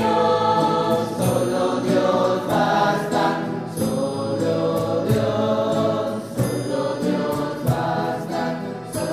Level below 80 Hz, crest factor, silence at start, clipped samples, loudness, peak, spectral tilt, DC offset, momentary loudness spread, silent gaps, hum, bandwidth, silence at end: -52 dBFS; 14 dB; 0 s; under 0.1%; -21 LUFS; -6 dBFS; -6 dB/octave; under 0.1%; 7 LU; none; none; 15.5 kHz; 0 s